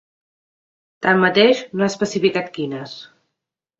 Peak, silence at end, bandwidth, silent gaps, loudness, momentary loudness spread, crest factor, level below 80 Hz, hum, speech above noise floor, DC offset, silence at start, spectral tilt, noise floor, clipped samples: -2 dBFS; 0.75 s; 8 kHz; none; -18 LUFS; 16 LU; 20 dB; -64 dBFS; none; 64 dB; under 0.1%; 1 s; -5 dB/octave; -82 dBFS; under 0.1%